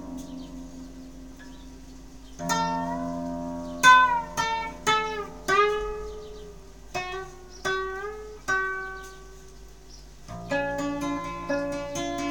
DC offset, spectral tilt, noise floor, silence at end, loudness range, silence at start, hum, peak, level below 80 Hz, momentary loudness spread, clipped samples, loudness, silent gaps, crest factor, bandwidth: 0.3%; -3 dB/octave; -47 dBFS; 0 s; 10 LU; 0 s; none; -4 dBFS; -48 dBFS; 23 LU; under 0.1%; -26 LUFS; none; 24 dB; 18 kHz